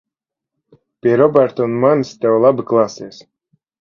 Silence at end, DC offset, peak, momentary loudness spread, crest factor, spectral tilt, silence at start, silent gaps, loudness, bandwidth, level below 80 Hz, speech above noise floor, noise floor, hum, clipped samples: 0.7 s; under 0.1%; 0 dBFS; 9 LU; 16 dB; -7.5 dB/octave; 1.05 s; none; -15 LUFS; 7.2 kHz; -60 dBFS; 69 dB; -83 dBFS; none; under 0.1%